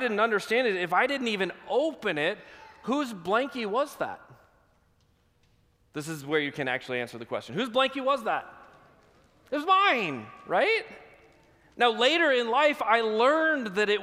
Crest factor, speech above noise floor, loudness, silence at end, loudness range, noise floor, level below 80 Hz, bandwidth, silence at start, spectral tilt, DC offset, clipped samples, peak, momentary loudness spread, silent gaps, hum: 20 dB; 40 dB; -26 LUFS; 0 s; 9 LU; -66 dBFS; -70 dBFS; 15.5 kHz; 0 s; -4 dB/octave; under 0.1%; under 0.1%; -8 dBFS; 13 LU; none; none